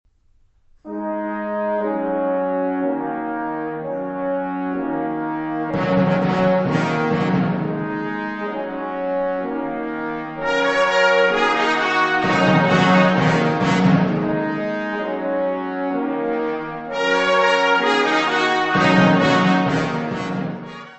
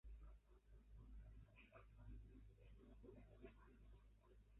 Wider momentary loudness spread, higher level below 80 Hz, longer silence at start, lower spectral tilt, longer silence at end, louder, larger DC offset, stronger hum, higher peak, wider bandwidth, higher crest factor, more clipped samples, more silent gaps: first, 11 LU vs 5 LU; first, -52 dBFS vs -66 dBFS; first, 0.85 s vs 0.05 s; about the same, -6 dB/octave vs -6.5 dB/octave; about the same, 0 s vs 0 s; first, -19 LUFS vs -66 LUFS; neither; neither; first, -2 dBFS vs -50 dBFS; first, 8.4 kHz vs 3.9 kHz; about the same, 18 dB vs 14 dB; neither; neither